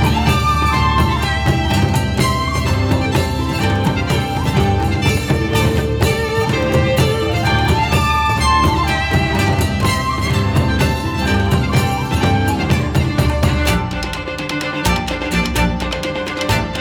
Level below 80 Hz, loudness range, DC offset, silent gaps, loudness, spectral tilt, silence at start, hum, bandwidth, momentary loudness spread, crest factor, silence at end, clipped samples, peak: -24 dBFS; 2 LU; under 0.1%; none; -16 LUFS; -5.5 dB/octave; 0 s; none; 19 kHz; 4 LU; 12 dB; 0 s; under 0.1%; -2 dBFS